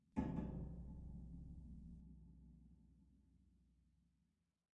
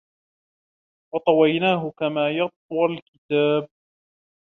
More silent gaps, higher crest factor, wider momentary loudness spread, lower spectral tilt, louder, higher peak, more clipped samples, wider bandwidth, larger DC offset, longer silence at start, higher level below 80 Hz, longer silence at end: second, none vs 2.56-2.69 s, 3.02-3.29 s; first, 24 dB vs 18 dB; first, 20 LU vs 9 LU; first, -10 dB/octave vs -8.5 dB/octave; second, -52 LUFS vs -22 LUFS; second, -30 dBFS vs -6 dBFS; neither; first, 7.6 kHz vs 4.1 kHz; neither; second, 0.15 s vs 1.15 s; first, -60 dBFS vs -70 dBFS; first, 1.1 s vs 0.85 s